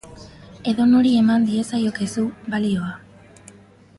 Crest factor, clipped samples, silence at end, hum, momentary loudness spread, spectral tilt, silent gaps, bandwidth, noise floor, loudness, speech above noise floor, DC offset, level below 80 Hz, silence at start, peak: 14 dB; under 0.1%; 1 s; none; 12 LU; -6 dB/octave; none; 11.5 kHz; -47 dBFS; -20 LUFS; 29 dB; under 0.1%; -54 dBFS; 0.05 s; -8 dBFS